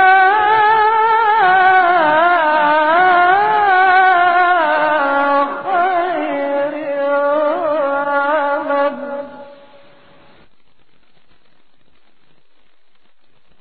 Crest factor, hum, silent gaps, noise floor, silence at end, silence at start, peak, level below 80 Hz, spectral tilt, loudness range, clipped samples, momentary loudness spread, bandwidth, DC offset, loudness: 14 dB; none; none; -61 dBFS; 4.05 s; 0 s; 0 dBFS; -62 dBFS; -7 dB/octave; 10 LU; under 0.1%; 9 LU; 4.8 kHz; 0.8%; -13 LUFS